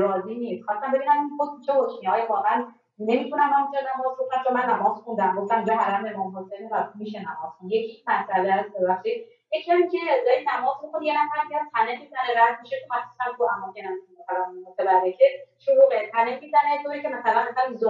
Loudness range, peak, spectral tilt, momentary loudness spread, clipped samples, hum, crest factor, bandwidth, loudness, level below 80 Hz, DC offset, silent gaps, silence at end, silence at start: 4 LU; -6 dBFS; -7 dB/octave; 11 LU; under 0.1%; none; 18 dB; 7.2 kHz; -24 LUFS; -84 dBFS; under 0.1%; none; 0 s; 0 s